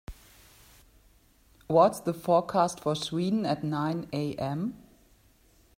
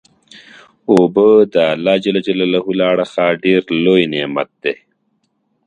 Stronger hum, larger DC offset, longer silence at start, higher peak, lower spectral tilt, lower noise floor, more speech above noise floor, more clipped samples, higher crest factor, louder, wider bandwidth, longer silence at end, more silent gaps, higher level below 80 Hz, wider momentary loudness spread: neither; neither; second, 0.1 s vs 0.35 s; second, -8 dBFS vs 0 dBFS; about the same, -6 dB/octave vs -6.5 dB/octave; about the same, -62 dBFS vs -65 dBFS; second, 34 dB vs 52 dB; neither; first, 22 dB vs 14 dB; second, -28 LUFS vs -14 LUFS; first, 16 kHz vs 9.6 kHz; about the same, 1 s vs 0.9 s; neither; about the same, -58 dBFS vs -58 dBFS; about the same, 10 LU vs 11 LU